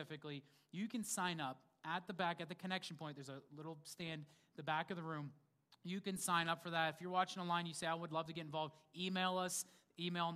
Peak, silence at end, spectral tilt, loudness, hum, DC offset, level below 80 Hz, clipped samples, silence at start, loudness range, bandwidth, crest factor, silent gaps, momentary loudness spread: -22 dBFS; 0 s; -3.5 dB/octave; -43 LUFS; none; under 0.1%; -86 dBFS; under 0.1%; 0 s; 6 LU; 15.5 kHz; 22 dB; none; 14 LU